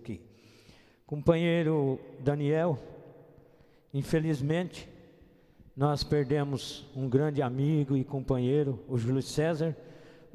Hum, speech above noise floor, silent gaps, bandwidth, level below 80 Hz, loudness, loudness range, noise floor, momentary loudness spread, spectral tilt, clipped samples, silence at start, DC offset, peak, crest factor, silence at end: none; 31 dB; none; 13 kHz; -56 dBFS; -30 LUFS; 3 LU; -60 dBFS; 12 LU; -7.5 dB/octave; under 0.1%; 0 s; under 0.1%; -10 dBFS; 22 dB; 0.25 s